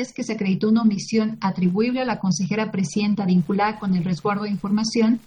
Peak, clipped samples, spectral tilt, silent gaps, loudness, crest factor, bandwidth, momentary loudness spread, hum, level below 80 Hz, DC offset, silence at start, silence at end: -8 dBFS; under 0.1%; -6 dB/octave; none; -22 LUFS; 12 dB; 9.8 kHz; 4 LU; none; -58 dBFS; under 0.1%; 0 s; 0.05 s